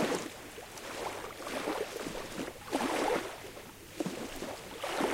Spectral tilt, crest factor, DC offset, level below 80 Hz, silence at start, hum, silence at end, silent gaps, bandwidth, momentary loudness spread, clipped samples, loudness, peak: -3.5 dB/octave; 20 dB; under 0.1%; -60 dBFS; 0 s; none; 0 s; none; 16 kHz; 13 LU; under 0.1%; -37 LUFS; -18 dBFS